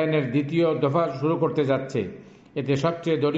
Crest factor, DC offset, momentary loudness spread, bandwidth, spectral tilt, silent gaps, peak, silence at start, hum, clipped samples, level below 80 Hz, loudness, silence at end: 14 dB; under 0.1%; 8 LU; 7.8 kHz; -7.5 dB/octave; none; -10 dBFS; 0 s; none; under 0.1%; -62 dBFS; -24 LUFS; 0 s